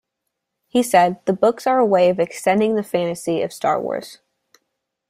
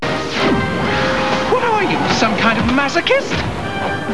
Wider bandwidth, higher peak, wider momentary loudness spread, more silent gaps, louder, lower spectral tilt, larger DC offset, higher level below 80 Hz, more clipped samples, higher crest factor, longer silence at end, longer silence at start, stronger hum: first, 15.5 kHz vs 11 kHz; about the same, -2 dBFS vs 0 dBFS; about the same, 7 LU vs 6 LU; neither; second, -19 LUFS vs -16 LUFS; about the same, -5 dB/octave vs -5 dB/octave; second, under 0.1% vs 2%; second, -64 dBFS vs -36 dBFS; neither; about the same, 18 dB vs 16 dB; first, 0.95 s vs 0 s; first, 0.75 s vs 0 s; neither